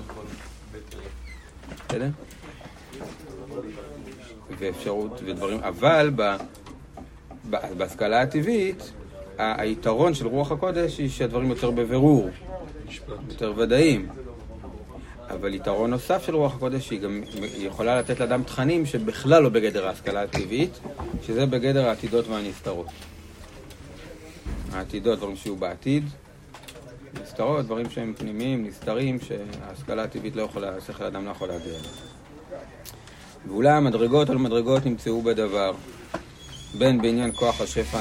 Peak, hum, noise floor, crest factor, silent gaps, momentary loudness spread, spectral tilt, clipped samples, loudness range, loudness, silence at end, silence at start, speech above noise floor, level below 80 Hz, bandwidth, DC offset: -2 dBFS; none; -45 dBFS; 24 dB; none; 22 LU; -6 dB/octave; under 0.1%; 10 LU; -25 LUFS; 0 s; 0 s; 21 dB; -46 dBFS; 16 kHz; under 0.1%